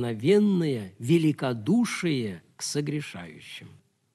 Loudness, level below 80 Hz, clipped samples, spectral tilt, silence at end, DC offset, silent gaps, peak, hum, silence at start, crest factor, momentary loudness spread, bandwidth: -26 LUFS; -70 dBFS; under 0.1%; -6 dB/octave; 0.5 s; under 0.1%; none; -10 dBFS; none; 0 s; 16 dB; 19 LU; 13.5 kHz